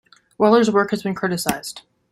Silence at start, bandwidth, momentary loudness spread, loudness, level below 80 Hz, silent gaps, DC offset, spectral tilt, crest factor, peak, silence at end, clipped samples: 0.4 s; 16 kHz; 16 LU; -19 LUFS; -58 dBFS; none; under 0.1%; -5 dB/octave; 20 dB; 0 dBFS; 0.3 s; under 0.1%